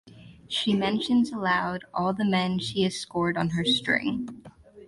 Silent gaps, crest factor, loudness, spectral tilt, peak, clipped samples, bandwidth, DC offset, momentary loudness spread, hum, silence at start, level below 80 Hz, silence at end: none; 18 dB; -26 LUFS; -5 dB/octave; -10 dBFS; under 0.1%; 11.5 kHz; under 0.1%; 7 LU; none; 0.05 s; -58 dBFS; 0 s